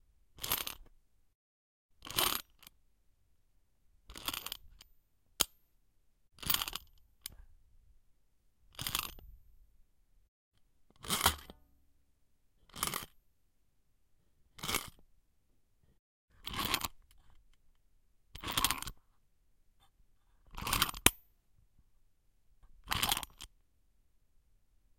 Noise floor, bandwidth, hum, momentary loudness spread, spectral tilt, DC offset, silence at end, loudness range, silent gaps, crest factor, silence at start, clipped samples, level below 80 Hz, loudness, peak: -75 dBFS; 17 kHz; none; 21 LU; -1 dB/octave; under 0.1%; 1.5 s; 10 LU; 1.35-1.89 s, 10.28-10.52 s, 15.99-16.28 s; 40 dB; 0.35 s; under 0.1%; -56 dBFS; -35 LUFS; -2 dBFS